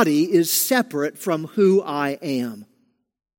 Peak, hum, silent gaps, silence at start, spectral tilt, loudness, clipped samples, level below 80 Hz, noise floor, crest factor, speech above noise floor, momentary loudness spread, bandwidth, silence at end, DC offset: -4 dBFS; none; none; 0 s; -4 dB/octave; -20 LUFS; under 0.1%; -74 dBFS; -66 dBFS; 18 dB; 46 dB; 8 LU; 17 kHz; 0.75 s; under 0.1%